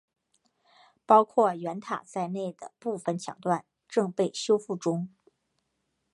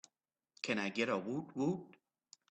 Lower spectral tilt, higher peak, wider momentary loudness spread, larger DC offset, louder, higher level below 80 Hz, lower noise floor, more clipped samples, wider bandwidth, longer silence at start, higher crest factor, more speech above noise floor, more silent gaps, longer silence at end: about the same, -5.5 dB/octave vs -5 dB/octave; first, -6 dBFS vs -20 dBFS; first, 13 LU vs 8 LU; neither; first, -28 LUFS vs -38 LUFS; about the same, -82 dBFS vs -82 dBFS; second, -78 dBFS vs -87 dBFS; neither; first, 11.5 kHz vs 8.8 kHz; first, 1.1 s vs 0.65 s; about the same, 22 dB vs 20 dB; about the same, 51 dB vs 50 dB; neither; first, 1.05 s vs 0.6 s